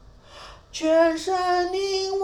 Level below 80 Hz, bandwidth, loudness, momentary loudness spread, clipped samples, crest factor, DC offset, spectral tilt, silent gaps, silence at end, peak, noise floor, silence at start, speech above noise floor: -52 dBFS; 12.5 kHz; -22 LUFS; 20 LU; under 0.1%; 16 dB; under 0.1%; -3 dB/octave; none; 0 s; -8 dBFS; -45 dBFS; 0.3 s; 23 dB